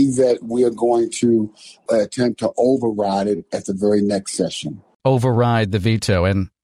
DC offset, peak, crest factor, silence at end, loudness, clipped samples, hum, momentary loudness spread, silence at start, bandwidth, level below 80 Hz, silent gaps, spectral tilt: under 0.1%; -6 dBFS; 12 dB; 0.15 s; -19 LUFS; under 0.1%; none; 7 LU; 0 s; 13 kHz; -48 dBFS; 4.95-5.00 s; -6 dB/octave